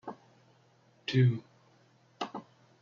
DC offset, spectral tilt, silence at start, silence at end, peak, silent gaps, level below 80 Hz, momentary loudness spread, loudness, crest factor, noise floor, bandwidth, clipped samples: under 0.1%; -6.5 dB/octave; 0.05 s; 0.4 s; -16 dBFS; none; -76 dBFS; 20 LU; -32 LUFS; 18 dB; -65 dBFS; 7 kHz; under 0.1%